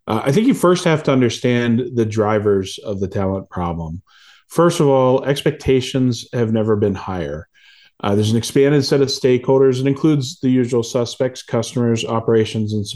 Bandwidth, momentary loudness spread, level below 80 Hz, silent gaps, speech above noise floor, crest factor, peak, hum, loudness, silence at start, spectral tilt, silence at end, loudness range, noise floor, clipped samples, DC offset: 12.5 kHz; 10 LU; -46 dBFS; none; 33 dB; 14 dB; -2 dBFS; none; -17 LUFS; 0.05 s; -6 dB/octave; 0 s; 3 LU; -50 dBFS; under 0.1%; under 0.1%